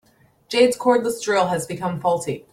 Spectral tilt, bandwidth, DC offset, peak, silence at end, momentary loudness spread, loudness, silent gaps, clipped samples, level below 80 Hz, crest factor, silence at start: -4.5 dB/octave; 16 kHz; under 0.1%; -4 dBFS; 0.15 s; 8 LU; -20 LUFS; none; under 0.1%; -62 dBFS; 18 dB; 0.5 s